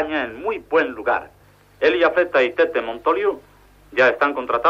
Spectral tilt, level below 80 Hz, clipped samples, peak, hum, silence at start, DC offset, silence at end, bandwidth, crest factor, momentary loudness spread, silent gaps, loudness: -5 dB/octave; -54 dBFS; under 0.1%; -4 dBFS; 50 Hz at -60 dBFS; 0 s; under 0.1%; 0 s; 7.4 kHz; 16 dB; 9 LU; none; -20 LUFS